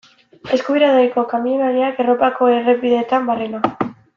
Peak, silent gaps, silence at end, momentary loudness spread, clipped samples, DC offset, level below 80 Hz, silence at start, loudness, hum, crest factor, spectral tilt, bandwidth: -2 dBFS; none; 0.25 s; 7 LU; under 0.1%; under 0.1%; -62 dBFS; 0.45 s; -17 LUFS; none; 14 dB; -6 dB/octave; 7 kHz